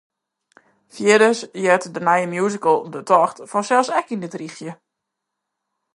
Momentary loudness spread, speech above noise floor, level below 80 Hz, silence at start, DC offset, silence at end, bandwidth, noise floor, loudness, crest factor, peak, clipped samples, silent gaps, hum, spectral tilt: 16 LU; 62 dB; -74 dBFS; 0.95 s; under 0.1%; 1.2 s; 11.5 kHz; -80 dBFS; -18 LUFS; 20 dB; 0 dBFS; under 0.1%; none; none; -4.5 dB/octave